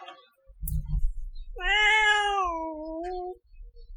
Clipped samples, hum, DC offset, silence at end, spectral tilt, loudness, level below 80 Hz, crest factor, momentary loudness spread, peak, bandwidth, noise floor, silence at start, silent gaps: under 0.1%; none; under 0.1%; 0 s; -3 dB/octave; -25 LUFS; -36 dBFS; 18 dB; 20 LU; -10 dBFS; 19 kHz; -53 dBFS; 0 s; none